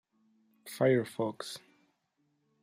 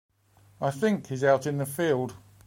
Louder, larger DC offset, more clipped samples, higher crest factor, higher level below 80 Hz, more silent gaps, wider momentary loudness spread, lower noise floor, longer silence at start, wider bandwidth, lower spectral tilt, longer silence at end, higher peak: second, -31 LUFS vs -27 LUFS; neither; neither; about the same, 20 dB vs 18 dB; second, -80 dBFS vs -68 dBFS; neither; first, 19 LU vs 8 LU; first, -77 dBFS vs -60 dBFS; about the same, 0.65 s vs 0.6 s; about the same, 15.5 kHz vs 16.5 kHz; about the same, -6 dB/octave vs -6 dB/octave; first, 1.05 s vs 0.3 s; second, -16 dBFS vs -10 dBFS